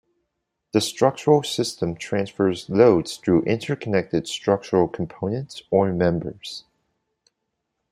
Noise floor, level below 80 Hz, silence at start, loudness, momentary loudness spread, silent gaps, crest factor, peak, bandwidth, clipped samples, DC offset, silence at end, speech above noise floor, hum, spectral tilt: -78 dBFS; -56 dBFS; 0.75 s; -22 LUFS; 11 LU; none; 20 dB; -2 dBFS; 15.5 kHz; under 0.1%; under 0.1%; 1.3 s; 57 dB; none; -5.5 dB/octave